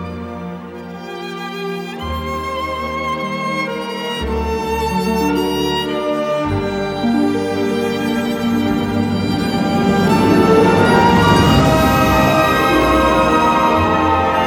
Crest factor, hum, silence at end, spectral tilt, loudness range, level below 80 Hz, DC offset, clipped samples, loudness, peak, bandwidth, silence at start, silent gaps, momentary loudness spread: 14 dB; none; 0 s; -6 dB/octave; 10 LU; -32 dBFS; under 0.1%; under 0.1%; -15 LUFS; 0 dBFS; 18.5 kHz; 0 s; none; 13 LU